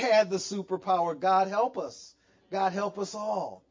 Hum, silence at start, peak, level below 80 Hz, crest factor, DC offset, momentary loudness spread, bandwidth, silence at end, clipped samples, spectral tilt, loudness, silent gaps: none; 0 s; -12 dBFS; -76 dBFS; 16 dB; under 0.1%; 12 LU; 7.6 kHz; 0.15 s; under 0.1%; -4 dB/octave; -29 LUFS; none